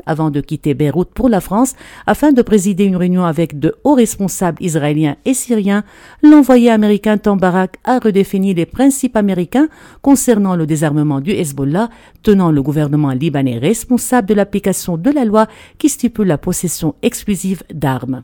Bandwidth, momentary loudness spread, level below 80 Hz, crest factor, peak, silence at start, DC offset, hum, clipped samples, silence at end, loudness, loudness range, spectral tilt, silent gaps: 17.5 kHz; 7 LU; -40 dBFS; 14 dB; 0 dBFS; 0.05 s; under 0.1%; none; 0.2%; 0 s; -14 LUFS; 3 LU; -6 dB/octave; none